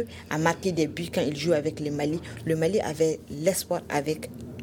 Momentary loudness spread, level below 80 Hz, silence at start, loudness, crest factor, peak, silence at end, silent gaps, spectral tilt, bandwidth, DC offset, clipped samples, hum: 6 LU; -56 dBFS; 0 s; -27 LUFS; 20 dB; -6 dBFS; 0 s; none; -5 dB/octave; 18.5 kHz; under 0.1%; under 0.1%; none